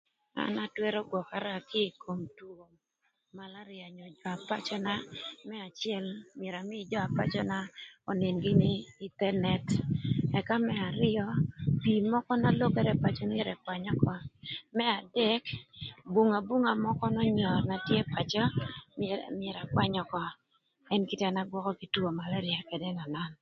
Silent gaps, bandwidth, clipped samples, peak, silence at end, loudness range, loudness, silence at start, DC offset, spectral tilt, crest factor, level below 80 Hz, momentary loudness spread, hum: none; 7.8 kHz; under 0.1%; -12 dBFS; 0.05 s; 9 LU; -32 LUFS; 0.35 s; under 0.1%; -7 dB/octave; 20 dB; -58 dBFS; 14 LU; none